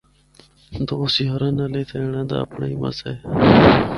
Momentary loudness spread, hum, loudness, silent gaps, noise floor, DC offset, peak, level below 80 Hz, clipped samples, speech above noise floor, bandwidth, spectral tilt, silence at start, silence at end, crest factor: 14 LU; none; -19 LUFS; none; -52 dBFS; under 0.1%; 0 dBFS; -40 dBFS; under 0.1%; 34 dB; 11.5 kHz; -7.5 dB/octave; 0.7 s; 0 s; 18 dB